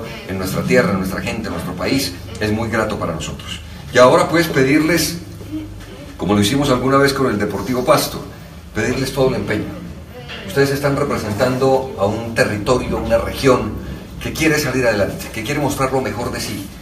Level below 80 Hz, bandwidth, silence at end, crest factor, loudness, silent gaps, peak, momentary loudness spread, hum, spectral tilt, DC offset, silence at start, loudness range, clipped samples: -36 dBFS; 15.5 kHz; 0 s; 18 dB; -17 LUFS; none; 0 dBFS; 15 LU; none; -5 dB/octave; under 0.1%; 0 s; 4 LU; under 0.1%